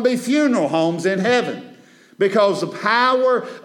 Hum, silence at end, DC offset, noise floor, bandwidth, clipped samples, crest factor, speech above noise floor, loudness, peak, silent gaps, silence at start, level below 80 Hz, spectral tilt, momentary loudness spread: none; 0.05 s; under 0.1%; -47 dBFS; 17 kHz; under 0.1%; 16 dB; 29 dB; -18 LUFS; -2 dBFS; none; 0 s; -78 dBFS; -5 dB/octave; 6 LU